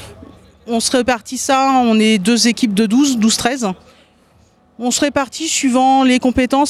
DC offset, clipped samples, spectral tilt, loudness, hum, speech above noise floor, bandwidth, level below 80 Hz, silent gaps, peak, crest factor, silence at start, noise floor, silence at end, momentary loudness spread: under 0.1%; under 0.1%; -3.5 dB/octave; -14 LUFS; none; 38 dB; 13.5 kHz; -46 dBFS; none; -2 dBFS; 14 dB; 0 s; -52 dBFS; 0 s; 7 LU